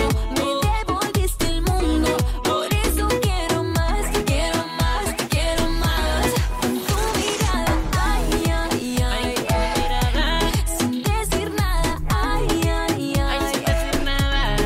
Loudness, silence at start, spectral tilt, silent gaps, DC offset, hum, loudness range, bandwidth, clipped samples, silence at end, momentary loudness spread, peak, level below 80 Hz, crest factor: -22 LUFS; 0 s; -4.5 dB/octave; none; under 0.1%; none; 1 LU; 16 kHz; under 0.1%; 0 s; 2 LU; -10 dBFS; -24 dBFS; 10 dB